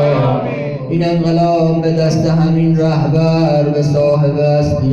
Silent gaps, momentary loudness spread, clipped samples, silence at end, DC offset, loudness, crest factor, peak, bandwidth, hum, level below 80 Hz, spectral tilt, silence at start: none; 4 LU; under 0.1%; 0 s; under 0.1%; -13 LUFS; 10 dB; -4 dBFS; 7.2 kHz; none; -38 dBFS; -8.5 dB/octave; 0 s